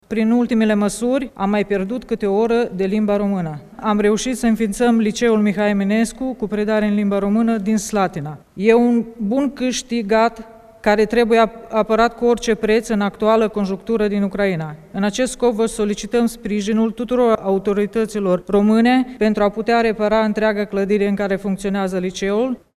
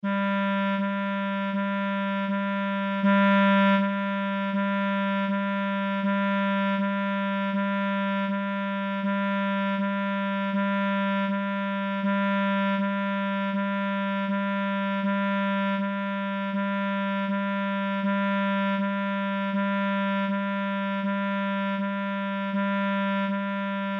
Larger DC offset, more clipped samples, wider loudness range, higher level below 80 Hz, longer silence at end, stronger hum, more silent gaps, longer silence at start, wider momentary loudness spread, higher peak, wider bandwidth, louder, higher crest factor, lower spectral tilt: neither; neither; about the same, 2 LU vs 3 LU; first, -44 dBFS vs -82 dBFS; first, 0.2 s vs 0 s; neither; neither; about the same, 0.1 s vs 0.05 s; first, 6 LU vs 3 LU; first, 0 dBFS vs -14 dBFS; first, 13.5 kHz vs 4.8 kHz; first, -18 LUFS vs -26 LUFS; first, 18 dB vs 12 dB; second, -5.5 dB/octave vs -8.5 dB/octave